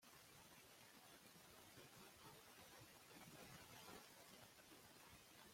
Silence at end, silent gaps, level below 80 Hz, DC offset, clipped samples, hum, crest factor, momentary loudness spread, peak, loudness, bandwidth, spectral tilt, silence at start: 0 s; none; -86 dBFS; under 0.1%; under 0.1%; none; 16 dB; 4 LU; -48 dBFS; -63 LUFS; 16.5 kHz; -2.5 dB/octave; 0 s